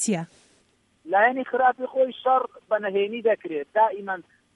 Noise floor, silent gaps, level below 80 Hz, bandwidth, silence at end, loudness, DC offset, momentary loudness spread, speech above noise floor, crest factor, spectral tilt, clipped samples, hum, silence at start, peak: -64 dBFS; none; -76 dBFS; 11.5 kHz; 0.35 s; -24 LUFS; under 0.1%; 10 LU; 41 dB; 18 dB; -4 dB/octave; under 0.1%; none; 0 s; -8 dBFS